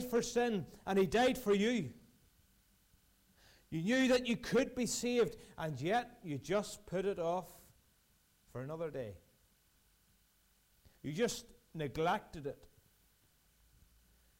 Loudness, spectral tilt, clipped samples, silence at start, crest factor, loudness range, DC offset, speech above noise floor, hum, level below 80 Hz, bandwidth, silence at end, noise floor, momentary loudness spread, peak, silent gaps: -36 LUFS; -4.5 dB/octave; under 0.1%; 0 s; 16 dB; 10 LU; under 0.1%; 37 dB; none; -64 dBFS; 16 kHz; 1.85 s; -72 dBFS; 15 LU; -22 dBFS; none